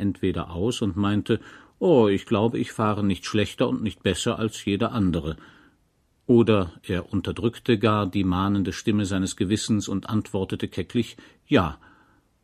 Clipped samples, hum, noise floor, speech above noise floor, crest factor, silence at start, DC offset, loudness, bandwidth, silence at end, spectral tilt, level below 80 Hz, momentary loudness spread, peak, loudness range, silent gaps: under 0.1%; none; -66 dBFS; 42 dB; 20 dB; 0 s; under 0.1%; -24 LUFS; 14 kHz; 0.7 s; -6 dB/octave; -48 dBFS; 9 LU; -4 dBFS; 3 LU; none